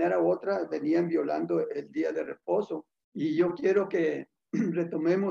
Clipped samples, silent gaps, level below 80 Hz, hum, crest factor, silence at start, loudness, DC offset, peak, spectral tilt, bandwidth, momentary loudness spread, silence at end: under 0.1%; 3.04-3.12 s; -76 dBFS; none; 16 dB; 0 s; -29 LUFS; under 0.1%; -12 dBFS; -8 dB/octave; 7 kHz; 9 LU; 0 s